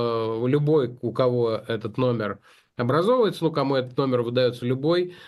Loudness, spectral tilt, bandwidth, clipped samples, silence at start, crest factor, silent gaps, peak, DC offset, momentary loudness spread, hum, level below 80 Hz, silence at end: -24 LUFS; -8 dB/octave; 12.5 kHz; under 0.1%; 0 s; 14 dB; none; -8 dBFS; under 0.1%; 8 LU; none; -66 dBFS; 0 s